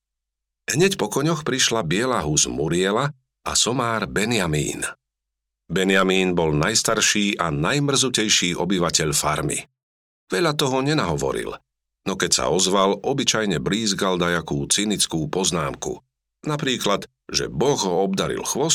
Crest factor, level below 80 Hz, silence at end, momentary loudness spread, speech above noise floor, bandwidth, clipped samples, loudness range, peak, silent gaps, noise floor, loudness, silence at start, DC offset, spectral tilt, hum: 18 dB; -48 dBFS; 0 s; 10 LU; 62 dB; 17 kHz; under 0.1%; 4 LU; -4 dBFS; 9.83-10.27 s; -83 dBFS; -21 LUFS; 0.7 s; under 0.1%; -3 dB/octave; none